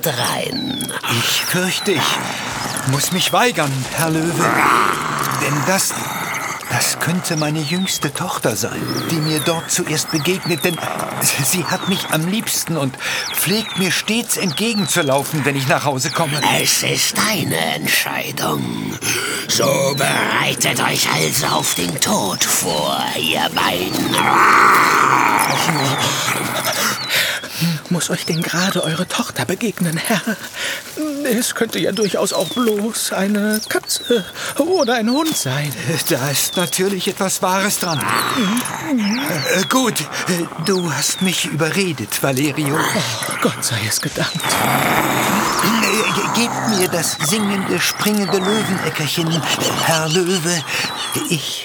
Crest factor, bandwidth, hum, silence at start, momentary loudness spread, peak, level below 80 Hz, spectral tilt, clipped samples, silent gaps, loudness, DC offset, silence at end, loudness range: 18 dB; over 20 kHz; none; 0 s; 6 LU; 0 dBFS; -54 dBFS; -3 dB/octave; under 0.1%; none; -17 LUFS; under 0.1%; 0 s; 5 LU